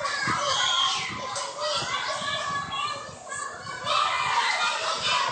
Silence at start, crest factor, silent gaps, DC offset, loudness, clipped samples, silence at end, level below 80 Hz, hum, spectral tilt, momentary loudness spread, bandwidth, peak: 0 s; 16 dB; none; under 0.1%; -26 LUFS; under 0.1%; 0 s; -62 dBFS; none; -1 dB/octave; 11 LU; 9.2 kHz; -10 dBFS